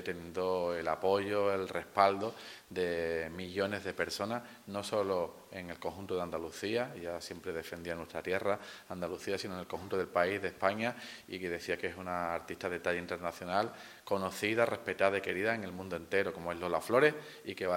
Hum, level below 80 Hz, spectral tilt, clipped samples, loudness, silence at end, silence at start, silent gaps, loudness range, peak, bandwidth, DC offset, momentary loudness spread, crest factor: none; -72 dBFS; -4.5 dB/octave; under 0.1%; -35 LUFS; 0 s; 0 s; none; 5 LU; -10 dBFS; 16.5 kHz; under 0.1%; 10 LU; 24 dB